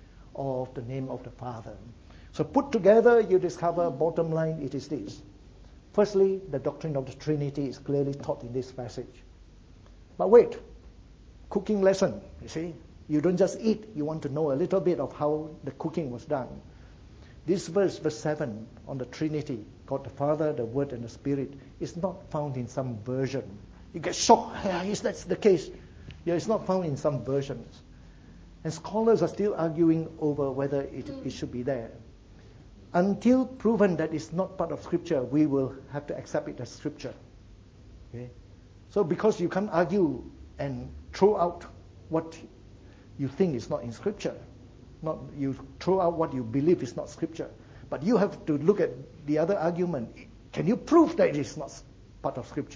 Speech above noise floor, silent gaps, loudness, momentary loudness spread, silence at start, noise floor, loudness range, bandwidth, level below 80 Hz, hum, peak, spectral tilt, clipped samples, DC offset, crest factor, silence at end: 24 dB; none; -28 LUFS; 16 LU; 0.15 s; -52 dBFS; 6 LU; 8 kHz; -54 dBFS; none; -4 dBFS; -6.5 dB/octave; under 0.1%; under 0.1%; 24 dB; 0 s